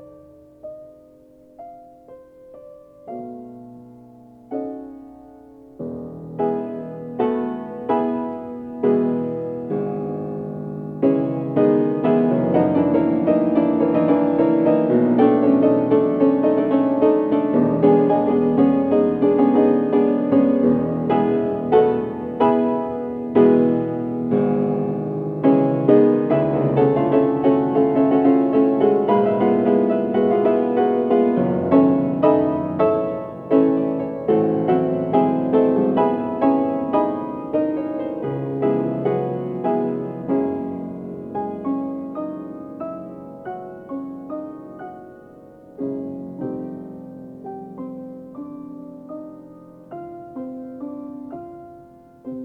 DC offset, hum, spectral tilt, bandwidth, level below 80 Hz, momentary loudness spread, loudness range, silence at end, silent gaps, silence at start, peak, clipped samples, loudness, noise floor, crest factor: under 0.1%; none; -11 dB/octave; 4.3 kHz; -58 dBFS; 19 LU; 18 LU; 0 s; none; 0 s; -2 dBFS; under 0.1%; -19 LUFS; -49 dBFS; 18 dB